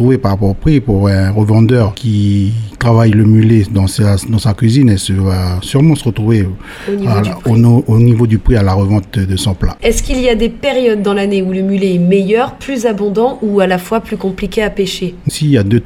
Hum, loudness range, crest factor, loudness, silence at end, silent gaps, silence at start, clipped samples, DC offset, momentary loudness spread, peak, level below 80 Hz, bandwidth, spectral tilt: none; 3 LU; 10 dB; -12 LUFS; 0 s; none; 0 s; under 0.1%; under 0.1%; 7 LU; 0 dBFS; -26 dBFS; 14.5 kHz; -7 dB/octave